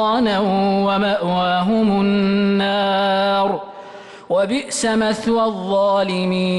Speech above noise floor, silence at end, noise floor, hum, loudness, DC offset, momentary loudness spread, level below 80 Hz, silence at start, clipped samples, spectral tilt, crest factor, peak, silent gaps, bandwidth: 20 dB; 0 s; -37 dBFS; none; -18 LUFS; under 0.1%; 5 LU; -52 dBFS; 0 s; under 0.1%; -5 dB/octave; 8 dB; -8 dBFS; none; 12 kHz